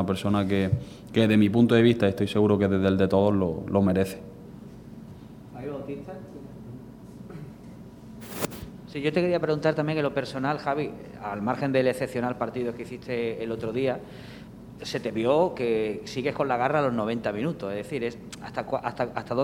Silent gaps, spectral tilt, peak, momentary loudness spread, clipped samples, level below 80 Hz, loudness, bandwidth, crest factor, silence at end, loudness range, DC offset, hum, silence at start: none; -7 dB/octave; -6 dBFS; 22 LU; under 0.1%; -54 dBFS; -26 LUFS; 16 kHz; 20 dB; 0 s; 16 LU; under 0.1%; none; 0 s